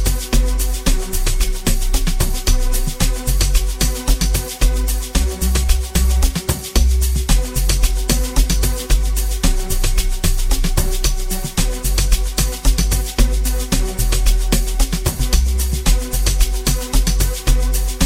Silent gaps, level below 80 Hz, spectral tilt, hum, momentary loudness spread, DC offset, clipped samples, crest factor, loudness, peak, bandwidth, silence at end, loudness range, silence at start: none; -16 dBFS; -3.5 dB/octave; none; 3 LU; under 0.1%; under 0.1%; 14 dB; -19 LUFS; 0 dBFS; 16.5 kHz; 0 s; 2 LU; 0 s